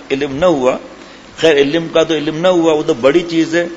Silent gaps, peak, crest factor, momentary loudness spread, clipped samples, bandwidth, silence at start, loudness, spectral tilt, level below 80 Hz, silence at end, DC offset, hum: none; 0 dBFS; 14 dB; 5 LU; under 0.1%; 8 kHz; 0 s; -13 LUFS; -5 dB/octave; -46 dBFS; 0 s; under 0.1%; none